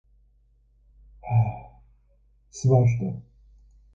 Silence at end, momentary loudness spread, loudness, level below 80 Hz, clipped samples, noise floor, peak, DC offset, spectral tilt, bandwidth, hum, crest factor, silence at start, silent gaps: 0.75 s; 22 LU; -24 LUFS; -50 dBFS; under 0.1%; -61 dBFS; -8 dBFS; under 0.1%; -8.5 dB/octave; 7.6 kHz; none; 20 dB; 1.25 s; none